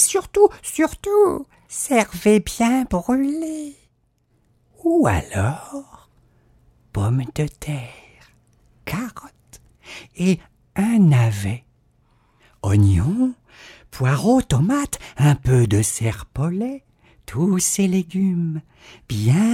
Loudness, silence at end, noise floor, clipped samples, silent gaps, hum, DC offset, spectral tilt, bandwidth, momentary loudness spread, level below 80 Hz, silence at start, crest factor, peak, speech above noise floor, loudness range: -20 LUFS; 0 s; -64 dBFS; under 0.1%; none; none; under 0.1%; -6 dB/octave; 16.5 kHz; 15 LU; -42 dBFS; 0 s; 20 dB; -2 dBFS; 45 dB; 9 LU